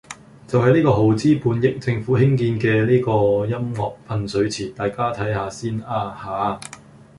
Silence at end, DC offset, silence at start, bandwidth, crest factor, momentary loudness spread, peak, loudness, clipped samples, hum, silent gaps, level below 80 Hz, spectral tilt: 0.4 s; under 0.1%; 0.1 s; 11.5 kHz; 18 dB; 11 LU; -2 dBFS; -20 LUFS; under 0.1%; none; none; -48 dBFS; -7 dB/octave